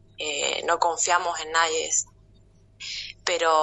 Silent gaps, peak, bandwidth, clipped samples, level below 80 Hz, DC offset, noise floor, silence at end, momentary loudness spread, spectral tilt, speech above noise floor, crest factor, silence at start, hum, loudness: none; -4 dBFS; 8.4 kHz; under 0.1%; -60 dBFS; under 0.1%; -55 dBFS; 0 s; 11 LU; 0.5 dB/octave; 32 dB; 20 dB; 0.2 s; none; -24 LUFS